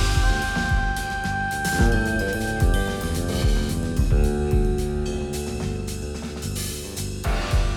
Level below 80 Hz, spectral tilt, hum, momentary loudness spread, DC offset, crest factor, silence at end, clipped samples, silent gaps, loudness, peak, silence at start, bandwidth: -26 dBFS; -5 dB/octave; none; 8 LU; under 0.1%; 16 dB; 0 s; under 0.1%; none; -24 LUFS; -8 dBFS; 0 s; 18 kHz